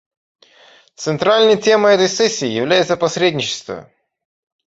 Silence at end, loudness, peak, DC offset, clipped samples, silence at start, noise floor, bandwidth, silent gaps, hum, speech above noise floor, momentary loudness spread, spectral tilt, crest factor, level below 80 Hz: 0.85 s; -15 LUFS; -2 dBFS; under 0.1%; under 0.1%; 1 s; -48 dBFS; 8 kHz; none; none; 33 dB; 14 LU; -3.5 dB/octave; 16 dB; -60 dBFS